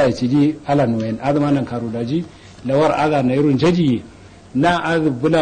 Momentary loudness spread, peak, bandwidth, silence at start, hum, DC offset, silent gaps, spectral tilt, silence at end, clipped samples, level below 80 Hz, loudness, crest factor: 9 LU; -4 dBFS; 9.4 kHz; 0 s; none; under 0.1%; none; -7.5 dB/octave; 0 s; under 0.1%; -48 dBFS; -18 LUFS; 14 dB